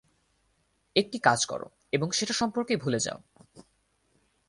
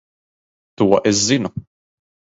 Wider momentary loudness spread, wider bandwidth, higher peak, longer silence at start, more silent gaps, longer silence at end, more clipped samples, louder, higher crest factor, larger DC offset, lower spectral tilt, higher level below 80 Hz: second, 8 LU vs 13 LU; first, 11.5 kHz vs 8 kHz; second, -6 dBFS vs 0 dBFS; first, 0.95 s vs 0.8 s; neither; first, 0.9 s vs 0.75 s; neither; second, -28 LUFS vs -17 LUFS; first, 26 dB vs 20 dB; neither; about the same, -3.5 dB/octave vs -4 dB/octave; second, -66 dBFS vs -52 dBFS